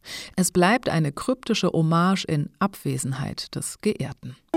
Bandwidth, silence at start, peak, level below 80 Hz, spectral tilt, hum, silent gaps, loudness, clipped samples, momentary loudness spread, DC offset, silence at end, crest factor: 16.5 kHz; 0.05 s; -6 dBFS; -54 dBFS; -5 dB/octave; none; none; -24 LUFS; under 0.1%; 11 LU; under 0.1%; 0 s; 18 dB